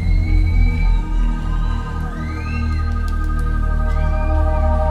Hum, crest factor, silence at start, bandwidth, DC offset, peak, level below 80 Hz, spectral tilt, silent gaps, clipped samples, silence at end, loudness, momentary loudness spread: none; 12 dB; 0 s; 5 kHz; under 0.1%; -4 dBFS; -18 dBFS; -8 dB/octave; none; under 0.1%; 0 s; -21 LUFS; 6 LU